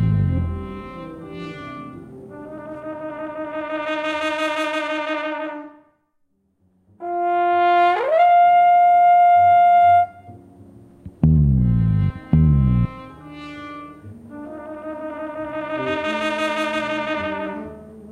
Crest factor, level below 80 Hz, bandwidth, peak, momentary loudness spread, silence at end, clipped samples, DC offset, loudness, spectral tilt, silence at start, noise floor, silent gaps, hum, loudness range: 16 dB; -34 dBFS; 10 kHz; -4 dBFS; 23 LU; 0 s; under 0.1%; under 0.1%; -18 LUFS; -7.5 dB/octave; 0 s; -66 dBFS; none; none; 14 LU